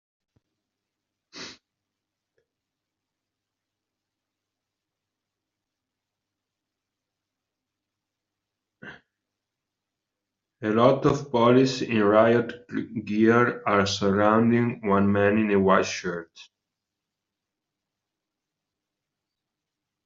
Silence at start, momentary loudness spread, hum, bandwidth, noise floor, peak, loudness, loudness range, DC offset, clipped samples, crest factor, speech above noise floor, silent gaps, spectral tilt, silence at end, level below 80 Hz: 1.35 s; 14 LU; none; 7.6 kHz; -86 dBFS; -4 dBFS; -22 LUFS; 8 LU; under 0.1%; under 0.1%; 22 dB; 64 dB; none; -5 dB/octave; 3.65 s; -62 dBFS